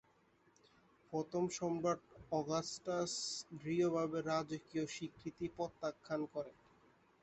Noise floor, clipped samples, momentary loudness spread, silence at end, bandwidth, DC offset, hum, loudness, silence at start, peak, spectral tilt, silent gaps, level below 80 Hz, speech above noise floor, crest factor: -72 dBFS; under 0.1%; 9 LU; 0.7 s; 8.4 kHz; under 0.1%; none; -41 LUFS; 1.1 s; -22 dBFS; -4.5 dB/octave; none; -74 dBFS; 32 dB; 18 dB